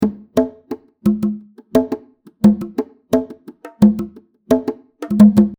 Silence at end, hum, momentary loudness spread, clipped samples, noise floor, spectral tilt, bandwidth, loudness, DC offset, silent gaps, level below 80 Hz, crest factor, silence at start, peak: 0.05 s; none; 19 LU; under 0.1%; -38 dBFS; -8.5 dB/octave; 15.5 kHz; -17 LUFS; under 0.1%; none; -48 dBFS; 16 dB; 0 s; 0 dBFS